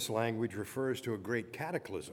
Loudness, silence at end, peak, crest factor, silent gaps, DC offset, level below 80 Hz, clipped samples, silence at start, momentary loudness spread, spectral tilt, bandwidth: -37 LUFS; 0 s; -18 dBFS; 18 dB; none; under 0.1%; -72 dBFS; under 0.1%; 0 s; 5 LU; -5 dB/octave; 18.5 kHz